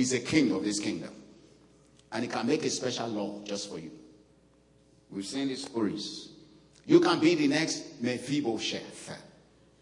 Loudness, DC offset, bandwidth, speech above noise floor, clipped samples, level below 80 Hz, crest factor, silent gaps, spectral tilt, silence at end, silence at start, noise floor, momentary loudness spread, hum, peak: -29 LUFS; under 0.1%; 11 kHz; 33 dB; under 0.1%; -70 dBFS; 22 dB; none; -4 dB/octave; 0.55 s; 0 s; -62 dBFS; 19 LU; none; -8 dBFS